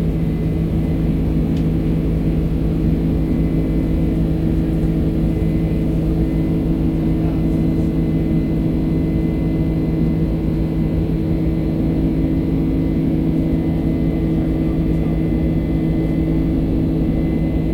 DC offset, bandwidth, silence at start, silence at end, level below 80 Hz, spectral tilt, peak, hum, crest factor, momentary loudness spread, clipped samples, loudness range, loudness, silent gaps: under 0.1%; 5.2 kHz; 0 s; 0 s; -24 dBFS; -10 dB/octave; -6 dBFS; none; 12 dB; 1 LU; under 0.1%; 0 LU; -18 LUFS; none